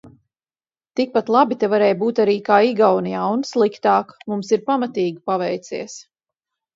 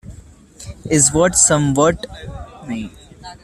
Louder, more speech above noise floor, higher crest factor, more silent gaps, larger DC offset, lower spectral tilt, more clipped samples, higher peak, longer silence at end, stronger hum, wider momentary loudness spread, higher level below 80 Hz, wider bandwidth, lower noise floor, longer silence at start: second, -19 LUFS vs -13 LUFS; first, over 72 dB vs 25 dB; about the same, 18 dB vs 18 dB; neither; neither; first, -5.5 dB/octave vs -4 dB/octave; neither; about the same, -2 dBFS vs 0 dBFS; first, 0.75 s vs 0.1 s; neither; second, 12 LU vs 22 LU; second, -68 dBFS vs -40 dBFS; second, 7.8 kHz vs 14 kHz; first, under -90 dBFS vs -41 dBFS; about the same, 0.05 s vs 0.05 s